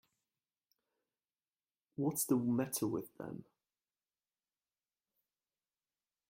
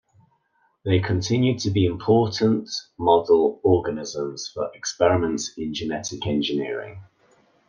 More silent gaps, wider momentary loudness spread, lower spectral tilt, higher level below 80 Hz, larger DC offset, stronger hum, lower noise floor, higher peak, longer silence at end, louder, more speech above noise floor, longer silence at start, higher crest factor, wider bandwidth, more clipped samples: neither; first, 16 LU vs 11 LU; about the same, -5.5 dB/octave vs -5.5 dB/octave; second, -80 dBFS vs -56 dBFS; neither; neither; first, under -90 dBFS vs -67 dBFS; second, -20 dBFS vs -4 dBFS; first, 2.9 s vs 0.65 s; second, -36 LUFS vs -23 LUFS; first, over 53 dB vs 45 dB; first, 2 s vs 0.85 s; about the same, 22 dB vs 20 dB; first, 16 kHz vs 9.8 kHz; neither